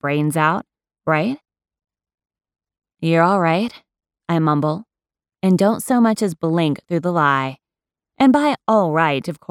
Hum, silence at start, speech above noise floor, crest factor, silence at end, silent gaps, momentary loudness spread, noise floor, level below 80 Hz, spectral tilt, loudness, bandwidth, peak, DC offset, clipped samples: none; 0.05 s; 72 dB; 16 dB; 0.15 s; none; 10 LU; -89 dBFS; -64 dBFS; -6.5 dB/octave; -18 LUFS; 16 kHz; -4 dBFS; under 0.1%; under 0.1%